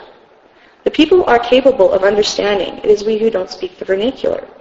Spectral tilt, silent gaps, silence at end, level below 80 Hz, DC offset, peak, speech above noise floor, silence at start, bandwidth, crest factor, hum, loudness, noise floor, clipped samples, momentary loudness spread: -4 dB/octave; none; 0.15 s; -44 dBFS; under 0.1%; 0 dBFS; 34 dB; 0 s; 7.8 kHz; 14 dB; none; -14 LUFS; -47 dBFS; under 0.1%; 10 LU